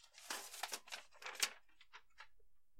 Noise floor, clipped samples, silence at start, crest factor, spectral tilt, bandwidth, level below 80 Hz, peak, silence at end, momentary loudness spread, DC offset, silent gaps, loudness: -73 dBFS; under 0.1%; 0 s; 30 dB; 2.5 dB/octave; 16 kHz; -84 dBFS; -20 dBFS; 0.2 s; 22 LU; under 0.1%; none; -45 LUFS